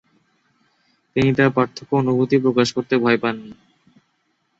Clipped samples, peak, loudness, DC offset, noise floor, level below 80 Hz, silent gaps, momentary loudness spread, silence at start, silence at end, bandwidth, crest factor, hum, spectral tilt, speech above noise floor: under 0.1%; -2 dBFS; -19 LUFS; under 0.1%; -68 dBFS; -54 dBFS; none; 7 LU; 1.15 s; 1.05 s; 8 kHz; 18 dB; none; -6.5 dB/octave; 50 dB